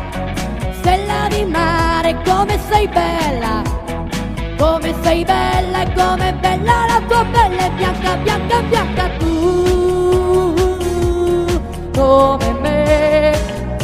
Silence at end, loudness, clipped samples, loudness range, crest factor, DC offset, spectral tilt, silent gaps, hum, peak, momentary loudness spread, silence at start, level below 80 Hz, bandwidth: 0 s; -15 LUFS; under 0.1%; 2 LU; 14 dB; under 0.1%; -5.5 dB/octave; none; none; 0 dBFS; 9 LU; 0 s; -24 dBFS; 15.5 kHz